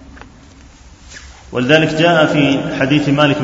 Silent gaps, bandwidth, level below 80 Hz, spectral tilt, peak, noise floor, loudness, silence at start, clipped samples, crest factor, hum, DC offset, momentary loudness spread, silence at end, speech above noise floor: none; 8 kHz; -42 dBFS; -6 dB/octave; 0 dBFS; -41 dBFS; -13 LUFS; 0.15 s; under 0.1%; 16 dB; none; under 0.1%; 6 LU; 0 s; 28 dB